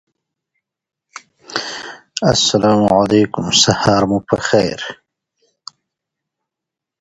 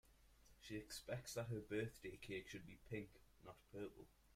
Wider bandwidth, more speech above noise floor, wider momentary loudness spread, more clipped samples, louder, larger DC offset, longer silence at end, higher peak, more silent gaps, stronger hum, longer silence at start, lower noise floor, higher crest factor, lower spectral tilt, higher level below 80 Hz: second, 11 kHz vs 16 kHz; first, 70 dB vs 19 dB; about the same, 15 LU vs 16 LU; neither; first, -14 LUFS vs -52 LUFS; neither; first, 2.05 s vs 0 s; first, 0 dBFS vs -34 dBFS; neither; neither; first, 1.5 s vs 0.05 s; first, -84 dBFS vs -70 dBFS; about the same, 18 dB vs 20 dB; about the same, -4 dB/octave vs -5 dB/octave; first, -46 dBFS vs -72 dBFS